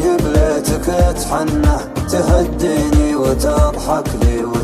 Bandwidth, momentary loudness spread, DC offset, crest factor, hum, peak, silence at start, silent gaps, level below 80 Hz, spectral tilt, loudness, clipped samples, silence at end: 15 kHz; 4 LU; under 0.1%; 12 dB; none; -2 dBFS; 0 s; none; -20 dBFS; -6 dB/octave; -15 LUFS; under 0.1%; 0 s